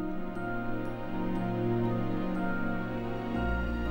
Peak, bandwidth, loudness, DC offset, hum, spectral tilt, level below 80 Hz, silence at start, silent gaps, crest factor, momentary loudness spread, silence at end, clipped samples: -20 dBFS; 16.5 kHz; -33 LUFS; under 0.1%; none; -9 dB/octave; -40 dBFS; 0 s; none; 12 dB; 6 LU; 0 s; under 0.1%